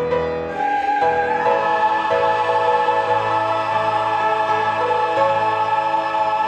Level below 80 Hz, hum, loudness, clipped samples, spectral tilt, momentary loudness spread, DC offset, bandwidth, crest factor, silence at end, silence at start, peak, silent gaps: -52 dBFS; none; -18 LUFS; under 0.1%; -5 dB/octave; 3 LU; under 0.1%; 8.8 kHz; 14 dB; 0 s; 0 s; -4 dBFS; none